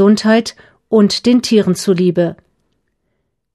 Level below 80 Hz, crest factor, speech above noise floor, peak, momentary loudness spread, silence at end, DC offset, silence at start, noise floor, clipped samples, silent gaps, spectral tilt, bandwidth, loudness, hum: -56 dBFS; 14 dB; 57 dB; 0 dBFS; 6 LU; 1.2 s; under 0.1%; 0 s; -69 dBFS; under 0.1%; none; -5.5 dB/octave; 13 kHz; -13 LUFS; none